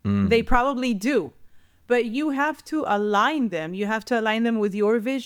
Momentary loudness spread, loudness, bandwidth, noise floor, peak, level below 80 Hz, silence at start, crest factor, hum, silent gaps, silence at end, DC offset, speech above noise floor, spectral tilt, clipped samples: 6 LU; -23 LUFS; 17 kHz; -49 dBFS; -6 dBFS; -38 dBFS; 0.05 s; 16 dB; none; none; 0 s; under 0.1%; 27 dB; -6 dB/octave; under 0.1%